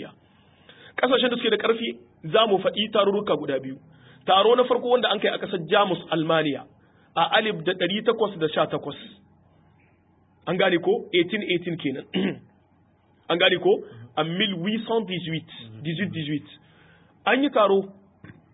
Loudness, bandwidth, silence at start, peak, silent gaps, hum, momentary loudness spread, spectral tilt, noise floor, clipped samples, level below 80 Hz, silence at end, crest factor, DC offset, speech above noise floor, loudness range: -23 LUFS; 4 kHz; 0 s; -6 dBFS; none; none; 13 LU; -9.5 dB/octave; -61 dBFS; under 0.1%; -68 dBFS; 0.25 s; 20 dB; under 0.1%; 37 dB; 4 LU